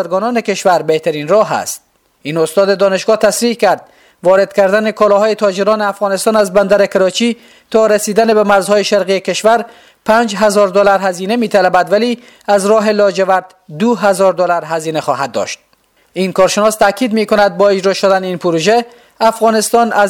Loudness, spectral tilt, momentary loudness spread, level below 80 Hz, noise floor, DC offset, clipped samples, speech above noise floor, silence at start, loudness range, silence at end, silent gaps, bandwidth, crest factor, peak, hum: -12 LUFS; -4 dB/octave; 7 LU; -52 dBFS; -54 dBFS; under 0.1%; under 0.1%; 42 dB; 0 s; 2 LU; 0 s; none; 18 kHz; 12 dB; 0 dBFS; none